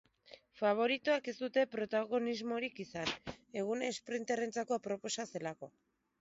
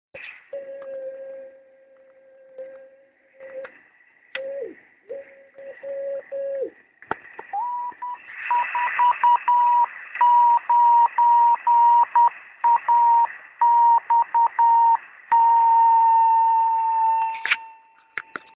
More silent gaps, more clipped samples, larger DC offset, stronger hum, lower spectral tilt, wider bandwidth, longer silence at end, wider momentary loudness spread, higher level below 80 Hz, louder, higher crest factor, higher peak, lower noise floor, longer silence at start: neither; neither; neither; neither; first, -2.5 dB/octave vs 1.5 dB/octave; first, 7.6 kHz vs 4 kHz; first, 0.5 s vs 0.35 s; second, 10 LU vs 22 LU; about the same, -72 dBFS vs -76 dBFS; second, -37 LUFS vs -19 LUFS; about the same, 18 dB vs 16 dB; second, -20 dBFS vs -6 dBFS; first, -61 dBFS vs -56 dBFS; first, 0.3 s vs 0.15 s